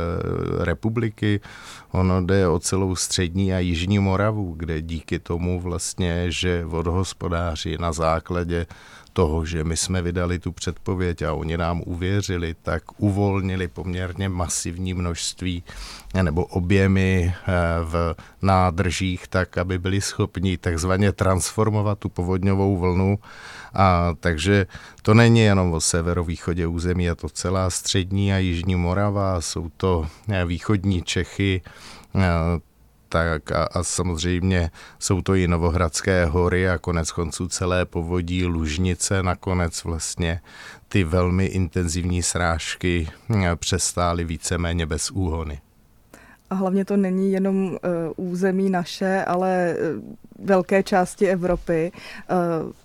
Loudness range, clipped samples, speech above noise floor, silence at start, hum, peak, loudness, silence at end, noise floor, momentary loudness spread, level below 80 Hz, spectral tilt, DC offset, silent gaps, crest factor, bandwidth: 5 LU; under 0.1%; 30 dB; 0 s; none; -2 dBFS; -23 LUFS; 0.15 s; -52 dBFS; 8 LU; -38 dBFS; -5.5 dB/octave; under 0.1%; none; 20 dB; 14 kHz